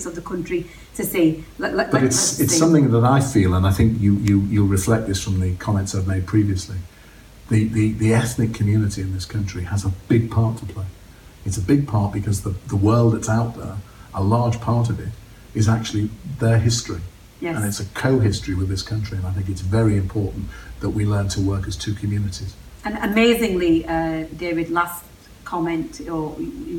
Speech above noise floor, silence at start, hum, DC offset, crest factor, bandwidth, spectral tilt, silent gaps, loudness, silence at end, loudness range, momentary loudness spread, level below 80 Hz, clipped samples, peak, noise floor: 25 dB; 0 s; none; under 0.1%; 18 dB; 17 kHz; -6 dB/octave; none; -21 LUFS; 0 s; 6 LU; 14 LU; -40 dBFS; under 0.1%; -2 dBFS; -44 dBFS